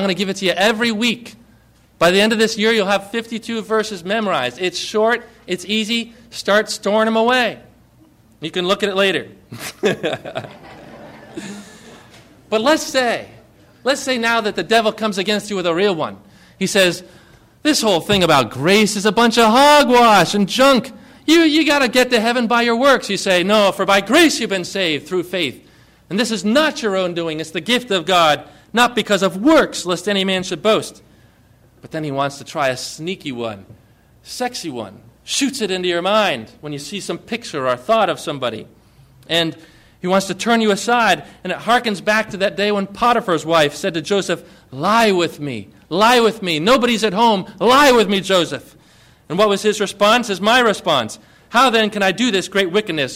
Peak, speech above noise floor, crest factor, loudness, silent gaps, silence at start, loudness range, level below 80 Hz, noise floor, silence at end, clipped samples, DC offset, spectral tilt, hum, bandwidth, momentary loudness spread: -2 dBFS; 34 dB; 14 dB; -16 LUFS; none; 0 s; 9 LU; -52 dBFS; -51 dBFS; 0 s; under 0.1%; under 0.1%; -3.5 dB/octave; none; 16 kHz; 13 LU